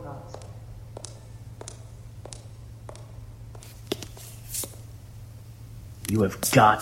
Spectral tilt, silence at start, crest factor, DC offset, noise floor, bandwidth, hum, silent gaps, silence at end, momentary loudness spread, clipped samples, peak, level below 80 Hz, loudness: -4.5 dB/octave; 0 s; 26 dB; under 0.1%; -43 dBFS; 16.5 kHz; none; none; 0 s; 20 LU; under 0.1%; -4 dBFS; -50 dBFS; -26 LUFS